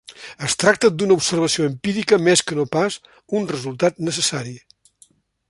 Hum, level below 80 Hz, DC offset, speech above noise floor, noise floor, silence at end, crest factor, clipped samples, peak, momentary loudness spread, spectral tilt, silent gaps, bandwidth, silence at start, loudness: none; -58 dBFS; under 0.1%; 37 dB; -56 dBFS; 0.9 s; 18 dB; under 0.1%; -2 dBFS; 12 LU; -3.5 dB/octave; none; 11.5 kHz; 0.1 s; -19 LUFS